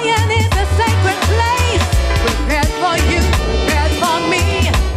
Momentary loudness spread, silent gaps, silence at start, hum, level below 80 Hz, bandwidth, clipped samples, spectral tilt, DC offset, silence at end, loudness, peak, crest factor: 2 LU; none; 0 s; none; -20 dBFS; 15.5 kHz; under 0.1%; -4.5 dB/octave; under 0.1%; 0 s; -15 LUFS; -4 dBFS; 10 dB